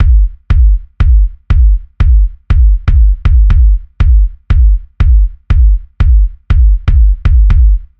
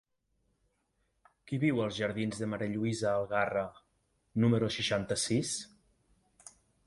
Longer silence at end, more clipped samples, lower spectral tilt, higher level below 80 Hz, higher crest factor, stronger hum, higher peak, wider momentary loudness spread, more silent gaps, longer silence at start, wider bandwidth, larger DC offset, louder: second, 0.15 s vs 1.2 s; first, 0.1% vs under 0.1%; first, -9 dB/octave vs -5 dB/octave; first, -8 dBFS vs -64 dBFS; second, 8 dB vs 20 dB; neither; first, 0 dBFS vs -14 dBFS; second, 4 LU vs 9 LU; neither; second, 0 s vs 1.45 s; second, 3.9 kHz vs 11.5 kHz; neither; first, -11 LUFS vs -32 LUFS